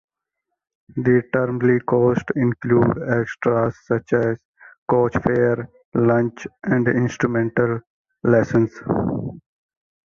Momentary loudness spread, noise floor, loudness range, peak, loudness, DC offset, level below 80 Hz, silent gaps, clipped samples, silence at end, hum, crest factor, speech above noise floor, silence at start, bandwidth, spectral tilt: 9 LU; -80 dBFS; 2 LU; -2 dBFS; -20 LUFS; under 0.1%; -50 dBFS; 4.45-4.54 s, 4.78-4.86 s, 5.85-5.92 s, 7.87-8.05 s; under 0.1%; 0.7 s; none; 18 dB; 61 dB; 0.95 s; 7 kHz; -9 dB/octave